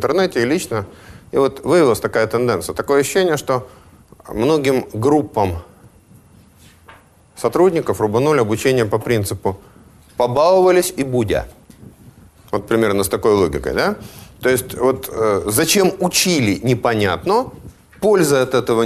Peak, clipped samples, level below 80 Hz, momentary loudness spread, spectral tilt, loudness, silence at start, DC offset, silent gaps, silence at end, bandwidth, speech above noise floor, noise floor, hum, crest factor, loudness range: 0 dBFS; under 0.1%; -44 dBFS; 9 LU; -4.5 dB/octave; -17 LUFS; 0 s; under 0.1%; none; 0 s; 13.5 kHz; 31 dB; -47 dBFS; none; 16 dB; 4 LU